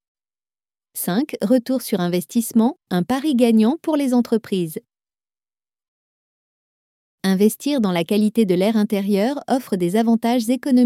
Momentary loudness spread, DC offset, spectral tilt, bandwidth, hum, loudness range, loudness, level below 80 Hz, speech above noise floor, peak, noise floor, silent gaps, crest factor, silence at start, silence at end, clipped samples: 6 LU; under 0.1%; -6 dB/octave; 16 kHz; none; 7 LU; -19 LUFS; -66 dBFS; over 72 dB; -4 dBFS; under -90 dBFS; 5.88-7.18 s; 16 dB; 0.95 s; 0 s; under 0.1%